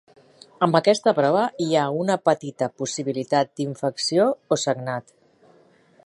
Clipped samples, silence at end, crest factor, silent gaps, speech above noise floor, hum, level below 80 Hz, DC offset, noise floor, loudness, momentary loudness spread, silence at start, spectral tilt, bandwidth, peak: under 0.1%; 1.05 s; 22 dB; none; 34 dB; none; -72 dBFS; under 0.1%; -56 dBFS; -22 LUFS; 8 LU; 0.6 s; -5 dB/octave; 11.5 kHz; 0 dBFS